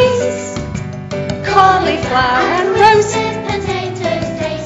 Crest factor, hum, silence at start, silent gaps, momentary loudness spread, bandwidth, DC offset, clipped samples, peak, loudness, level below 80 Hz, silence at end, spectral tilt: 14 dB; none; 0 s; none; 13 LU; 9.8 kHz; under 0.1%; 0.2%; 0 dBFS; -14 LUFS; -36 dBFS; 0 s; -4.5 dB/octave